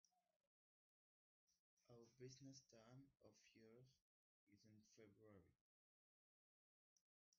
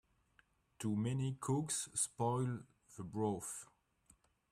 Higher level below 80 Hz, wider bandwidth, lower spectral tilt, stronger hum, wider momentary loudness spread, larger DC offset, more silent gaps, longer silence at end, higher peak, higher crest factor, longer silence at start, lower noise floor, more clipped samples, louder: second, under -90 dBFS vs -74 dBFS; second, 7 kHz vs 15 kHz; about the same, -5.5 dB/octave vs -5.5 dB/octave; neither; second, 6 LU vs 13 LU; neither; first, 0.36-0.40 s, 0.47-1.47 s, 1.59-1.77 s, 4.01-4.47 s, 5.61-7.32 s vs none; second, 0 s vs 0.85 s; second, -50 dBFS vs -24 dBFS; about the same, 22 dB vs 18 dB; second, 0.05 s vs 0.8 s; first, under -90 dBFS vs -74 dBFS; neither; second, -66 LUFS vs -40 LUFS